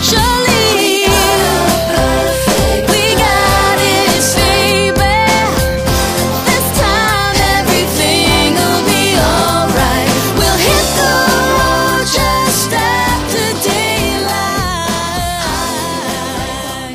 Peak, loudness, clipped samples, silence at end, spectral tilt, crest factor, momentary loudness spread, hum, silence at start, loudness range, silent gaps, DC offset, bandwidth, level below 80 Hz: 0 dBFS; -11 LUFS; under 0.1%; 0 s; -3.5 dB/octave; 12 dB; 6 LU; none; 0 s; 3 LU; none; under 0.1%; 16 kHz; -24 dBFS